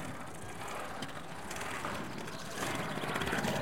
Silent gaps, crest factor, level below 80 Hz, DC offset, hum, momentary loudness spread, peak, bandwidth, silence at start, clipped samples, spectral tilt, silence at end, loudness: none; 20 dB; -60 dBFS; 0.5%; none; 10 LU; -18 dBFS; 16.5 kHz; 0 s; under 0.1%; -4 dB/octave; 0 s; -39 LUFS